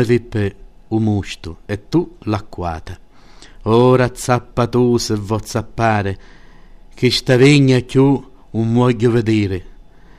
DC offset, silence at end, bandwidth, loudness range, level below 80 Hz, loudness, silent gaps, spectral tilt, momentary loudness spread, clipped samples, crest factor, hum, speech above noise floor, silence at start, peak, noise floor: 0.6%; 0.45 s; 14.5 kHz; 6 LU; -40 dBFS; -16 LUFS; none; -6.5 dB/octave; 15 LU; under 0.1%; 14 dB; none; 27 dB; 0 s; -2 dBFS; -42 dBFS